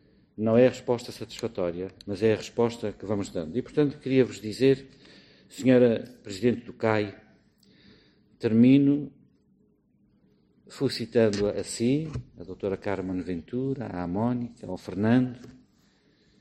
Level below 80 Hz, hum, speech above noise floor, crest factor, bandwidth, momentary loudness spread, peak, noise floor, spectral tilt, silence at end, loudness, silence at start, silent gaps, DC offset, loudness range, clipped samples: -58 dBFS; none; 39 dB; 20 dB; 12.5 kHz; 14 LU; -8 dBFS; -65 dBFS; -6.5 dB/octave; 0.9 s; -26 LUFS; 0.4 s; none; under 0.1%; 4 LU; under 0.1%